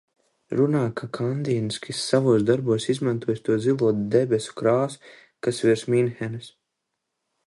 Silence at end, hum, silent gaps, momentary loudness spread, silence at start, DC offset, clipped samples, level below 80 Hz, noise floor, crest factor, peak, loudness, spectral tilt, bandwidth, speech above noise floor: 1 s; none; none; 9 LU; 0.5 s; under 0.1%; under 0.1%; -64 dBFS; -80 dBFS; 20 dB; -4 dBFS; -24 LUFS; -6.5 dB/octave; 11.5 kHz; 58 dB